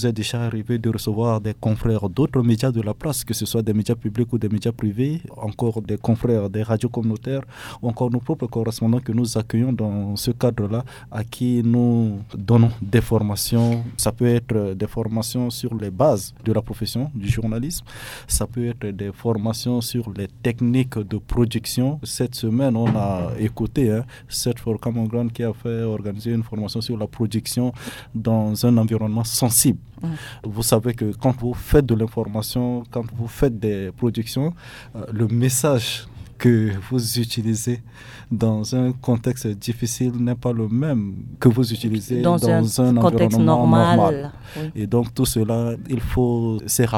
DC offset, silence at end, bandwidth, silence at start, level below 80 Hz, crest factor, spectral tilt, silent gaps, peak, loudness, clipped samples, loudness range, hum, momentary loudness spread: under 0.1%; 0 s; 17.5 kHz; 0 s; -40 dBFS; 20 dB; -6 dB/octave; none; -2 dBFS; -21 LUFS; under 0.1%; 5 LU; none; 10 LU